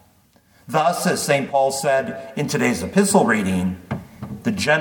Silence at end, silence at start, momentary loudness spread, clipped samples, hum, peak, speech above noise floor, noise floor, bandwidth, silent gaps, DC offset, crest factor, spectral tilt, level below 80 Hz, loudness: 0 s; 0.7 s; 12 LU; under 0.1%; none; -4 dBFS; 37 dB; -56 dBFS; 19 kHz; none; under 0.1%; 18 dB; -4.5 dB/octave; -54 dBFS; -20 LUFS